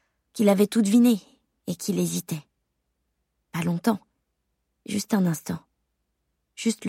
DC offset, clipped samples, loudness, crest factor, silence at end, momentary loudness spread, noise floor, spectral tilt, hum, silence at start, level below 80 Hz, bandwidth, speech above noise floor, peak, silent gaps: under 0.1%; under 0.1%; -25 LUFS; 18 dB; 0 s; 16 LU; -77 dBFS; -5.5 dB/octave; none; 0.35 s; -70 dBFS; 16.5 kHz; 54 dB; -8 dBFS; none